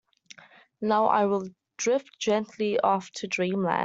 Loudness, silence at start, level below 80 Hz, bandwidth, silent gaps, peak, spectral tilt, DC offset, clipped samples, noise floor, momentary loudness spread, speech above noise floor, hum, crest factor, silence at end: -26 LUFS; 0.8 s; -74 dBFS; 8 kHz; none; -8 dBFS; -4.5 dB/octave; under 0.1%; under 0.1%; -53 dBFS; 8 LU; 27 dB; none; 18 dB; 0 s